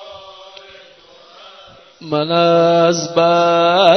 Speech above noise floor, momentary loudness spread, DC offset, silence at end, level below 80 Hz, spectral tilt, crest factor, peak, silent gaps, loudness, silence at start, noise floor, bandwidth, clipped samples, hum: 32 dB; 23 LU; under 0.1%; 0 s; -62 dBFS; -4.5 dB/octave; 16 dB; 0 dBFS; none; -13 LUFS; 0 s; -44 dBFS; 6.4 kHz; under 0.1%; none